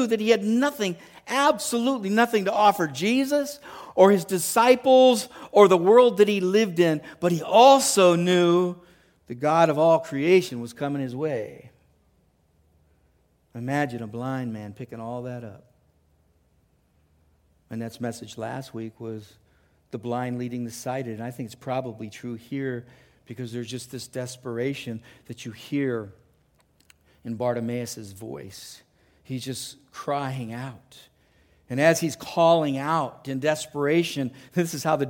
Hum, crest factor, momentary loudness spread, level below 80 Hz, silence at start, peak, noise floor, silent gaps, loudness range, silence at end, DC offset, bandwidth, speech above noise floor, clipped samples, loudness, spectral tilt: none; 22 dB; 20 LU; -66 dBFS; 0 s; -2 dBFS; -65 dBFS; none; 17 LU; 0 s; under 0.1%; 17 kHz; 41 dB; under 0.1%; -23 LUFS; -5 dB/octave